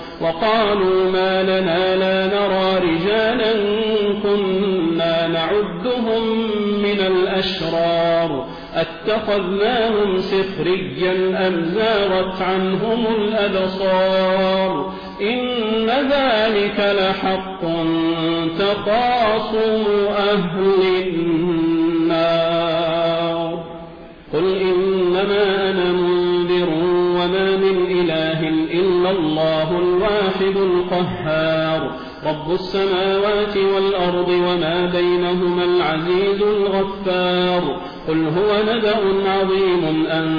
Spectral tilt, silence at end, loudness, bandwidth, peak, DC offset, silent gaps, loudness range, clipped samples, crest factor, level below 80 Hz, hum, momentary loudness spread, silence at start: -7.5 dB/octave; 0 s; -18 LUFS; 5.2 kHz; -8 dBFS; under 0.1%; none; 2 LU; under 0.1%; 10 dB; -46 dBFS; none; 4 LU; 0 s